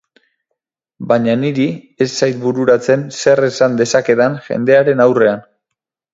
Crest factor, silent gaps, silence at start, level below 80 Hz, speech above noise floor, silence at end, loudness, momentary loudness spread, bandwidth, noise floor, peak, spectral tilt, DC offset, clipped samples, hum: 14 dB; none; 1 s; -60 dBFS; 66 dB; 0.75 s; -14 LUFS; 7 LU; 7.8 kHz; -79 dBFS; 0 dBFS; -5.5 dB/octave; under 0.1%; under 0.1%; none